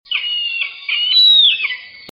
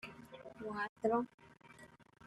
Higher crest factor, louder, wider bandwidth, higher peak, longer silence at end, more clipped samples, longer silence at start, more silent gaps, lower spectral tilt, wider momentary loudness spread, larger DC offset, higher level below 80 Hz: second, 14 dB vs 22 dB; first, -11 LUFS vs -39 LUFS; first, 14.5 kHz vs 13 kHz; first, -2 dBFS vs -22 dBFS; second, 0.05 s vs 0.25 s; neither; about the same, 0.1 s vs 0.05 s; second, none vs 0.89-0.96 s, 1.34-1.38 s; second, 1 dB/octave vs -6.5 dB/octave; second, 14 LU vs 23 LU; neither; first, -64 dBFS vs -76 dBFS